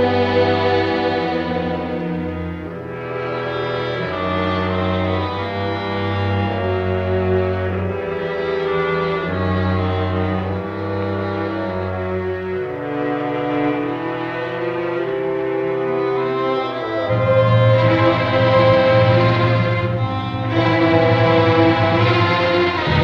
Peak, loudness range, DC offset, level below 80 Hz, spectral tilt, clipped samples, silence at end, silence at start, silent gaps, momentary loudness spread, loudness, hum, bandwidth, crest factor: -2 dBFS; 7 LU; under 0.1%; -44 dBFS; -8 dB/octave; under 0.1%; 0 s; 0 s; none; 9 LU; -18 LUFS; none; 6.6 kHz; 16 dB